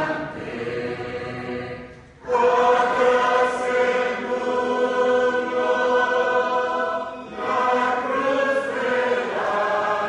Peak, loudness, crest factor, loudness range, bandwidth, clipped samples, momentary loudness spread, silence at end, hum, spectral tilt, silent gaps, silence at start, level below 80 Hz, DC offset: -6 dBFS; -22 LUFS; 16 dB; 2 LU; 10 kHz; under 0.1%; 12 LU; 0 s; none; -4.5 dB/octave; none; 0 s; -58 dBFS; under 0.1%